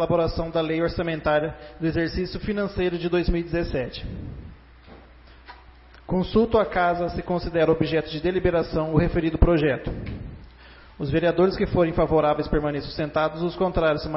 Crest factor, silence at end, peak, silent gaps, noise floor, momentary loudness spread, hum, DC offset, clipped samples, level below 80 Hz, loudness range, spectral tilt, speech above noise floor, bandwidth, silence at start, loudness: 22 dB; 0 s; -2 dBFS; none; -48 dBFS; 12 LU; none; under 0.1%; under 0.1%; -34 dBFS; 6 LU; -11 dB/octave; 26 dB; 5.8 kHz; 0 s; -24 LUFS